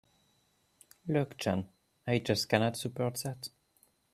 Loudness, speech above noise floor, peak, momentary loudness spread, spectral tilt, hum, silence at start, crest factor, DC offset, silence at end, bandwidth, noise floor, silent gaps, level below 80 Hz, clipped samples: -33 LUFS; 40 dB; -10 dBFS; 15 LU; -5 dB/octave; none; 1.05 s; 24 dB; under 0.1%; 0.65 s; 15.5 kHz; -72 dBFS; none; -68 dBFS; under 0.1%